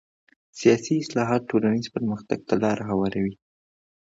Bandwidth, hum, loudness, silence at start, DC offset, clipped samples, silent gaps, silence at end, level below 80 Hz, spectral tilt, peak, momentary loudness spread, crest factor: 7.8 kHz; none; -24 LUFS; 0.55 s; under 0.1%; under 0.1%; none; 0.7 s; -58 dBFS; -6 dB/octave; -6 dBFS; 8 LU; 20 dB